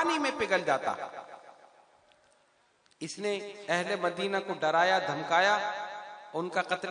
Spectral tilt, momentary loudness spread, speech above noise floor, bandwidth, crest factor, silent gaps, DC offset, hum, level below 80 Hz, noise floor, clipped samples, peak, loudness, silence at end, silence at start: -3.5 dB/octave; 16 LU; 38 dB; 10.5 kHz; 20 dB; none; under 0.1%; none; -78 dBFS; -68 dBFS; under 0.1%; -10 dBFS; -30 LUFS; 0 s; 0 s